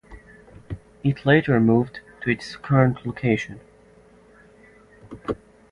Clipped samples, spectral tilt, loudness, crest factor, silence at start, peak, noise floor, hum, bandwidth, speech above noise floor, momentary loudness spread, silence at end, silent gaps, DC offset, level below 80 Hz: under 0.1%; -8 dB/octave; -22 LUFS; 22 dB; 0.1 s; -2 dBFS; -52 dBFS; none; 10.5 kHz; 32 dB; 19 LU; 0.35 s; none; under 0.1%; -50 dBFS